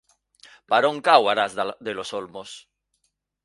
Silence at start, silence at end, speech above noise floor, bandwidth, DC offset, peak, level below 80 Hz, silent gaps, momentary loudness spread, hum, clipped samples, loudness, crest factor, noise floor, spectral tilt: 0.7 s; 0.85 s; 51 dB; 11.5 kHz; under 0.1%; 0 dBFS; -70 dBFS; none; 21 LU; 50 Hz at -65 dBFS; under 0.1%; -22 LUFS; 24 dB; -73 dBFS; -3 dB/octave